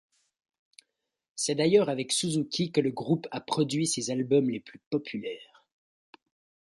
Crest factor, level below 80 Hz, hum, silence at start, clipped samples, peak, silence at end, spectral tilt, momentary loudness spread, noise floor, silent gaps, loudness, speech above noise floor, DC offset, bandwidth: 20 dB; -72 dBFS; none; 1.35 s; under 0.1%; -10 dBFS; 1.3 s; -4.5 dB/octave; 13 LU; -82 dBFS; 4.86-4.91 s; -28 LUFS; 54 dB; under 0.1%; 11.5 kHz